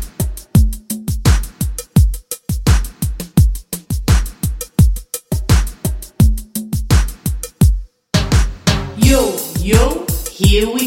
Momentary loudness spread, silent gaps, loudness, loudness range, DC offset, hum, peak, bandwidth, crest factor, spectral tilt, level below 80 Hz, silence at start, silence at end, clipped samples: 10 LU; none; -17 LUFS; 2 LU; under 0.1%; none; 0 dBFS; 17 kHz; 14 dB; -5.5 dB/octave; -18 dBFS; 0 s; 0 s; under 0.1%